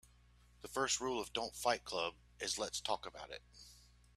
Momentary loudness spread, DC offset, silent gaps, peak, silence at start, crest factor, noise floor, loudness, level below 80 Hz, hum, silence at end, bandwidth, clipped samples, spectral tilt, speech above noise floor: 19 LU; under 0.1%; none; -20 dBFS; 0.05 s; 22 dB; -66 dBFS; -39 LUFS; -66 dBFS; 60 Hz at -65 dBFS; 0.35 s; 15.5 kHz; under 0.1%; -1.5 dB/octave; 26 dB